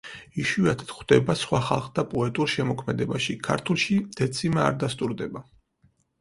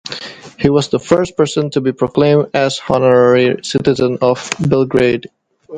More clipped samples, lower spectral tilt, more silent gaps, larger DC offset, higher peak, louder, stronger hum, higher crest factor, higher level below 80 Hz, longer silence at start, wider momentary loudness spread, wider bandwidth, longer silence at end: neither; about the same, -5.5 dB/octave vs -6 dB/octave; neither; neither; second, -4 dBFS vs 0 dBFS; second, -25 LUFS vs -14 LUFS; neither; first, 22 dB vs 14 dB; second, -54 dBFS vs -46 dBFS; about the same, 0.05 s vs 0.05 s; about the same, 8 LU vs 7 LU; first, 11.5 kHz vs 9.4 kHz; first, 0.8 s vs 0 s